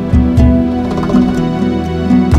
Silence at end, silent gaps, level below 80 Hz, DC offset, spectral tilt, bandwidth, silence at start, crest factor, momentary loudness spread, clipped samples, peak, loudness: 0 s; none; -18 dBFS; under 0.1%; -8.5 dB/octave; 9.4 kHz; 0 s; 10 dB; 5 LU; under 0.1%; 0 dBFS; -12 LUFS